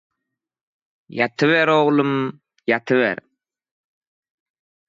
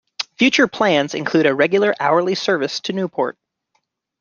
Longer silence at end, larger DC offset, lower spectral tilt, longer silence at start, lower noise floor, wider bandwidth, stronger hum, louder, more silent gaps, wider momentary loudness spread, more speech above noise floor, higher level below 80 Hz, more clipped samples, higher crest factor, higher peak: first, 1.75 s vs 0.9 s; neither; first, -6.5 dB/octave vs -4.5 dB/octave; first, 1.1 s vs 0.2 s; first, -82 dBFS vs -69 dBFS; about the same, 7.6 kHz vs 7.4 kHz; neither; about the same, -19 LUFS vs -17 LUFS; neither; first, 14 LU vs 8 LU; first, 64 dB vs 52 dB; second, -72 dBFS vs -64 dBFS; neither; about the same, 18 dB vs 16 dB; about the same, -4 dBFS vs -2 dBFS